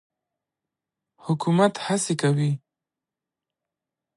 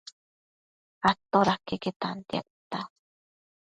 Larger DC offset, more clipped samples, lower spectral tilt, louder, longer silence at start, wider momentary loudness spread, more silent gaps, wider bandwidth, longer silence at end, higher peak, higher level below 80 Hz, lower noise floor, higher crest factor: neither; neither; about the same, -5.5 dB/octave vs -5.5 dB/octave; first, -23 LUFS vs -29 LUFS; first, 1.25 s vs 1 s; second, 10 LU vs 14 LU; second, none vs 1.96-2.00 s, 2.50-2.71 s; about the same, 11.5 kHz vs 10.5 kHz; first, 1.6 s vs 0.75 s; about the same, -6 dBFS vs -8 dBFS; second, -74 dBFS vs -62 dBFS; about the same, -88 dBFS vs under -90 dBFS; about the same, 20 dB vs 22 dB